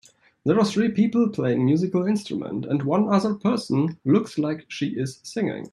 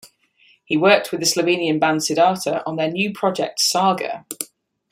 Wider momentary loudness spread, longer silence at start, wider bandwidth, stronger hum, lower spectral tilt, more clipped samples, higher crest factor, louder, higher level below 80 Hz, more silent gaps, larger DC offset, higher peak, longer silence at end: second, 8 LU vs 12 LU; first, 0.45 s vs 0.05 s; second, 11.5 kHz vs 16.5 kHz; neither; first, -7 dB/octave vs -3.5 dB/octave; neither; about the same, 16 dB vs 18 dB; second, -23 LUFS vs -19 LUFS; about the same, -64 dBFS vs -66 dBFS; neither; neither; second, -6 dBFS vs -2 dBFS; second, 0.05 s vs 0.45 s